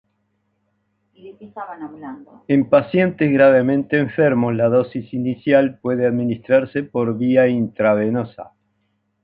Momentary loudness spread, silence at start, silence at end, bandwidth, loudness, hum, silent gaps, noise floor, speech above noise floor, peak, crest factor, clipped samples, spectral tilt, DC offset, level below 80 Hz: 18 LU; 1.25 s; 0.8 s; 4.9 kHz; -17 LUFS; none; none; -69 dBFS; 51 dB; -2 dBFS; 16 dB; under 0.1%; -10.5 dB/octave; under 0.1%; -60 dBFS